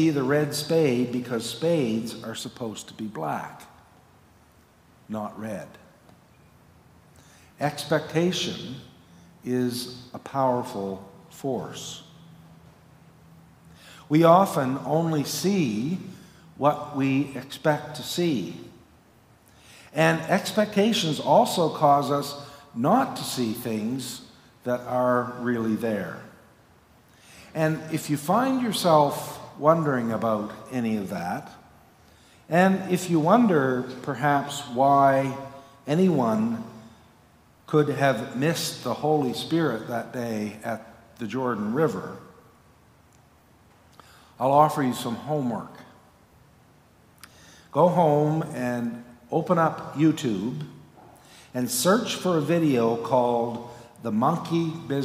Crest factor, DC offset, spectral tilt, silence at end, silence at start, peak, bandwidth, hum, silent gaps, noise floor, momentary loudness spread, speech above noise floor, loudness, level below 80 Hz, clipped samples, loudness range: 22 dB; under 0.1%; -5.5 dB/octave; 0 s; 0 s; -4 dBFS; 16 kHz; none; none; -57 dBFS; 16 LU; 33 dB; -25 LUFS; -66 dBFS; under 0.1%; 9 LU